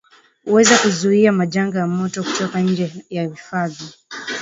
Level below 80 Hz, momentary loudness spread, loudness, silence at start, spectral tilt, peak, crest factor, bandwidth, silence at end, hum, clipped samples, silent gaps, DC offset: -62 dBFS; 15 LU; -18 LUFS; 0.45 s; -4.5 dB/octave; 0 dBFS; 18 dB; 8 kHz; 0 s; none; under 0.1%; none; under 0.1%